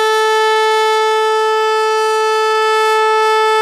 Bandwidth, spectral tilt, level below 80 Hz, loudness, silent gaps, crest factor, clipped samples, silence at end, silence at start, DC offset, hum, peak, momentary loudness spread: 15 kHz; 1.5 dB/octave; -68 dBFS; -13 LUFS; none; 8 dB; under 0.1%; 0 s; 0 s; under 0.1%; none; -4 dBFS; 2 LU